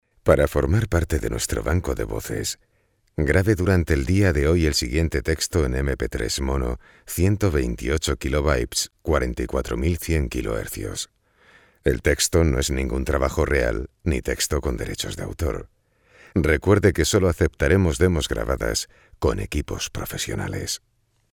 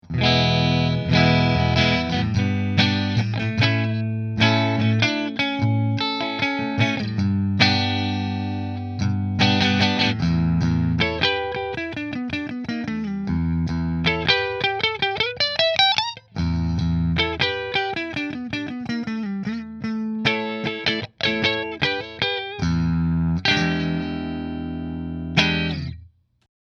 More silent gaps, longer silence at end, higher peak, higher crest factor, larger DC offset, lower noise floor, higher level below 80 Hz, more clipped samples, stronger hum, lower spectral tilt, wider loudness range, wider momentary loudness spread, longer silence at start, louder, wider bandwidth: neither; second, 0.55 s vs 0.75 s; second, -4 dBFS vs 0 dBFS; about the same, 20 dB vs 22 dB; neither; first, -56 dBFS vs -48 dBFS; first, -30 dBFS vs -40 dBFS; neither; neither; about the same, -5 dB/octave vs -6 dB/octave; about the same, 4 LU vs 4 LU; about the same, 9 LU vs 10 LU; first, 0.25 s vs 0.05 s; about the same, -23 LUFS vs -21 LUFS; first, 19.5 kHz vs 7 kHz